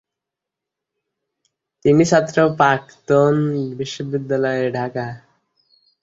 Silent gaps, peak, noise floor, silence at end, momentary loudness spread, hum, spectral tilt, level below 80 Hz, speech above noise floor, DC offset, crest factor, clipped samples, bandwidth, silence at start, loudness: none; -2 dBFS; -84 dBFS; 0.85 s; 11 LU; none; -6 dB/octave; -56 dBFS; 67 dB; under 0.1%; 18 dB; under 0.1%; 8 kHz; 1.85 s; -18 LUFS